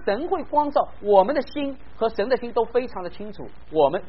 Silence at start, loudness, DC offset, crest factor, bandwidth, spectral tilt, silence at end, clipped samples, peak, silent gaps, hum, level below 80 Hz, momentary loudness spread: 0 s; -23 LUFS; 2%; 20 dB; 5.8 kHz; -4 dB/octave; 0.05 s; under 0.1%; -4 dBFS; none; none; -48 dBFS; 16 LU